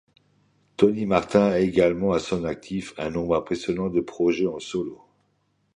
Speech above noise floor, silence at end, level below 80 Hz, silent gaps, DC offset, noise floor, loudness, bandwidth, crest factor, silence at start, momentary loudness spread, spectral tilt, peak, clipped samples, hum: 46 dB; 0.8 s; -52 dBFS; none; under 0.1%; -69 dBFS; -24 LUFS; 10.5 kHz; 22 dB; 0.8 s; 11 LU; -6.5 dB/octave; -4 dBFS; under 0.1%; none